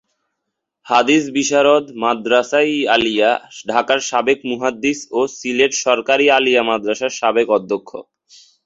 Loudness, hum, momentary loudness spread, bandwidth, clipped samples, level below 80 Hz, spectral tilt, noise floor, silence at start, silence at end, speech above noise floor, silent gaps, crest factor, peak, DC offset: -16 LUFS; none; 7 LU; 7.8 kHz; under 0.1%; -60 dBFS; -2.5 dB/octave; -77 dBFS; 0.85 s; 0.65 s; 61 dB; none; 16 dB; 0 dBFS; under 0.1%